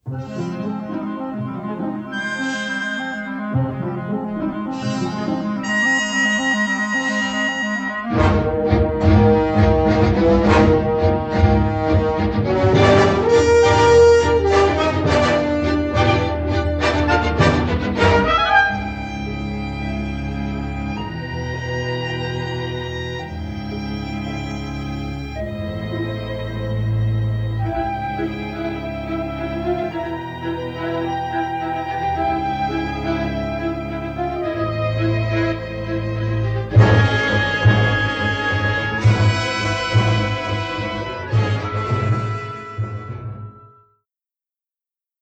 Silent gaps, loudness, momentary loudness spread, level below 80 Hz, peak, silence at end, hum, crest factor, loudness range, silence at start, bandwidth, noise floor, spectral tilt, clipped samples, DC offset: none; -19 LUFS; 12 LU; -32 dBFS; 0 dBFS; 1.55 s; none; 18 dB; 11 LU; 0.05 s; 8.4 kHz; under -90 dBFS; -6.5 dB/octave; under 0.1%; under 0.1%